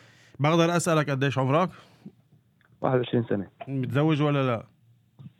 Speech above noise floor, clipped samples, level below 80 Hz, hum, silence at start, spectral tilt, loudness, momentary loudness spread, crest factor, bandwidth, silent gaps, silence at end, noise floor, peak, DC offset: 37 dB; under 0.1%; -72 dBFS; none; 0.4 s; -6 dB/octave; -25 LUFS; 9 LU; 18 dB; 13.5 kHz; none; 0.1 s; -62 dBFS; -8 dBFS; under 0.1%